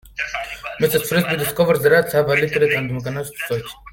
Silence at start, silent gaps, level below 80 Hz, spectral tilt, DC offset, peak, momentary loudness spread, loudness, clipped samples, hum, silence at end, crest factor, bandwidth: 0.05 s; none; -50 dBFS; -5 dB/octave; under 0.1%; -2 dBFS; 12 LU; -19 LUFS; under 0.1%; none; 0 s; 18 dB; 17 kHz